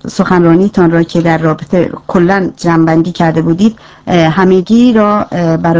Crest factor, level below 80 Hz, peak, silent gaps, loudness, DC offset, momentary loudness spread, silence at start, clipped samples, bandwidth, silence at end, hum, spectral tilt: 8 dB; -40 dBFS; 0 dBFS; none; -10 LUFS; 0.4%; 5 LU; 0.05 s; 0.4%; 8 kHz; 0 s; none; -7.5 dB/octave